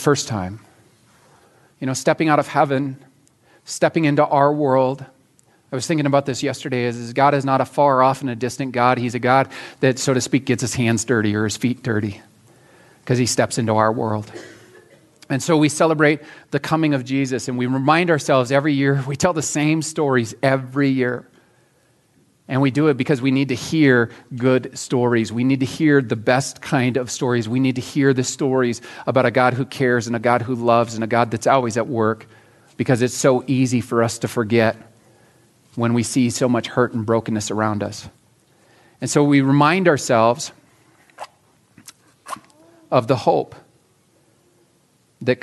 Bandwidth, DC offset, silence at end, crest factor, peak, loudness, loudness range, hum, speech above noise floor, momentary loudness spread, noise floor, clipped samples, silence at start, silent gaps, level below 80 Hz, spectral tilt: 12 kHz; under 0.1%; 0.05 s; 18 dB; 0 dBFS; -19 LUFS; 4 LU; none; 41 dB; 10 LU; -60 dBFS; under 0.1%; 0 s; none; -62 dBFS; -5.5 dB/octave